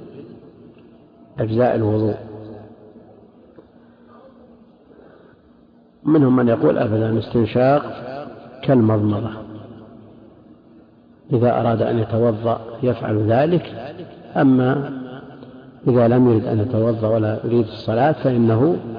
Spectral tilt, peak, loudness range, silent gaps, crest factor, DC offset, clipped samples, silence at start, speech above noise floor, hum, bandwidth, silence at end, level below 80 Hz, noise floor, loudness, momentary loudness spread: -11 dB/octave; -8 dBFS; 6 LU; none; 12 dB; under 0.1%; under 0.1%; 0 s; 34 dB; none; 5.2 kHz; 0 s; -54 dBFS; -51 dBFS; -18 LUFS; 21 LU